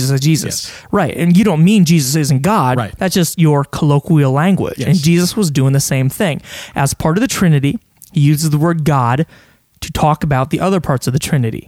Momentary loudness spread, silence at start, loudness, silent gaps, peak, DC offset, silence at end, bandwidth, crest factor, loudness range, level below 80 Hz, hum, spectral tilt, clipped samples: 7 LU; 0 s; -14 LUFS; none; 0 dBFS; under 0.1%; 0.05 s; 16 kHz; 12 dB; 3 LU; -40 dBFS; none; -6 dB/octave; under 0.1%